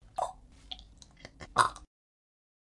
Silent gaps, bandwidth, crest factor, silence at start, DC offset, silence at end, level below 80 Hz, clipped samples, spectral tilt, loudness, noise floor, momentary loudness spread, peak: none; 11.5 kHz; 28 dB; 0.2 s; under 0.1%; 0.9 s; -58 dBFS; under 0.1%; -2 dB/octave; -31 LUFS; -54 dBFS; 24 LU; -8 dBFS